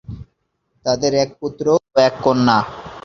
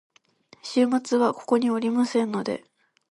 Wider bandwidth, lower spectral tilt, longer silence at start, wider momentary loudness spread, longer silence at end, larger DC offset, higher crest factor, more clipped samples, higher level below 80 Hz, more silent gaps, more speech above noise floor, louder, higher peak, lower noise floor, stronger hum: second, 7.4 kHz vs 11 kHz; about the same, -5 dB/octave vs -5 dB/octave; second, 0.1 s vs 0.65 s; first, 13 LU vs 9 LU; second, 0.05 s vs 0.5 s; neither; about the same, 18 dB vs 16 dB; neither; first, -48 dBFS vs -74 dBFS; neither; first, 51 dB vs 34 dB; first, -17 LUFS vs -24 LUFS; first, -2 dBFS vs -10 dBFS; first, -68 dBFS vs -57 dBFS; neither